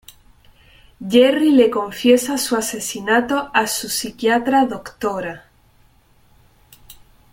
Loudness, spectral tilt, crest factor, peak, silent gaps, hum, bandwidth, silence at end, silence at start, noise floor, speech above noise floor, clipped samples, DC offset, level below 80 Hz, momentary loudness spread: -17 LUFS; -3 dB/octave; 18 dB; -2 dBFS; none; none; 17 kHz; 1.95 s; 1 s; -54 dBFS; 37 dB; under 0.1%; under 0.1%; -54 dBFS; 11 LU